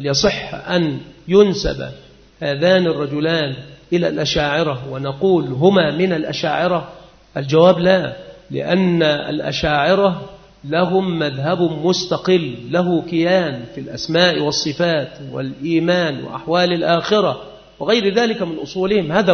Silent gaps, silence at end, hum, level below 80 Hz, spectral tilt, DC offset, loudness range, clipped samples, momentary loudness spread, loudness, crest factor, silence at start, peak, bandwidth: none; 0 s; none; -44 dBFS; -5.5 dB/octave; under 0.1%; 2 LU; under 0.1%; 13 LU; -17 LUFS; 18 dB; 0 s; 0 dBFS; 6.6 kHz